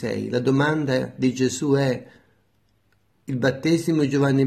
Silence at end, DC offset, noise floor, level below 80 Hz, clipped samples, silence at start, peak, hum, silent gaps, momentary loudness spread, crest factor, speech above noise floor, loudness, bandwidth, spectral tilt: 0 s; under 0.1%; -66 dBFS; -62 dBFS; under 0.1%; 0 s; -6 dBFS; none; none; 5 LU; 16 dB; 44 dB; -22 LUFS; 13.5 kHz; -6 dB/octave